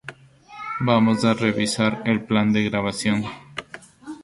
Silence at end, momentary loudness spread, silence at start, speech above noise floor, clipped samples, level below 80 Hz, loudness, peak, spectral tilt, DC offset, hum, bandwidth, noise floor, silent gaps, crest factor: 0.05 s; 19 LU; 0.05 s; 25 dB; under 0.1%; -54 dBFS; -21 LUFS; -4 dBFS; -5.5 dB/octave; under 0.1%; none; 11.5 kHz; -45 dBFS; none; 18 dB